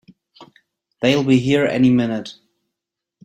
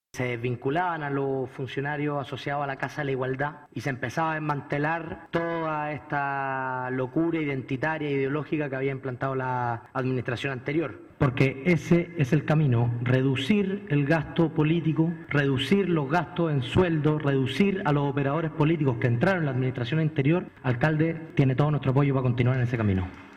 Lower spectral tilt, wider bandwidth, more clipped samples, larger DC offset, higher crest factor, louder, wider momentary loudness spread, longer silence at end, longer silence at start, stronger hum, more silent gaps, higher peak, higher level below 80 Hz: second, -6.5 dB/octave vs -8 dB/octave; about the same, 9 kHz vs 9.4 kHz; neither; neither; about the same, 18 dB vs 16 dB; first, -17 LUFS vs -26 LUFS; first, 11 LU vs 7 LU; first, 0.95 s vs 0 s; first, 0.4 s vs 0.15 s; neither; neither; first, -2 dBFS vs -10 dBFS; about the same, -56 dBFS vs -54 dBFS